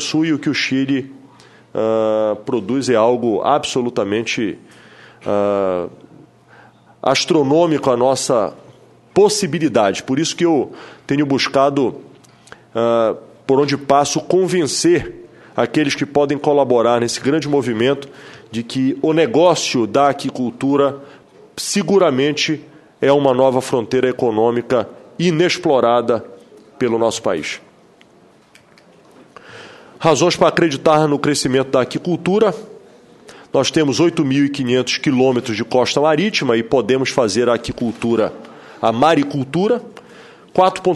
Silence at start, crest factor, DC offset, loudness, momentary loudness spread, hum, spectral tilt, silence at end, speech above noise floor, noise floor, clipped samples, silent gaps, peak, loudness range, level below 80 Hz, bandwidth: 0 s; 16 dB; under 0.1%; -16 LUFS; 9 LU; none; -5 dB/octave; 0 s; 33 dB; -49 dBFS; under 0.1%; none; 0 dBFS; 4 LU; -54 dBFS; 12.5 kHz